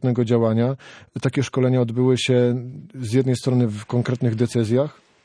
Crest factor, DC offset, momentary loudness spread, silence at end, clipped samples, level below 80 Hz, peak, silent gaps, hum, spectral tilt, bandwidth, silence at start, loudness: 16 dB; under 0.1%; 10 LU; 0.3 s; under 0.1%; -62 dBFS; -6 dBFS; none; none; -7 dB/octave; 11 kHz; 0 s; -21 LUFS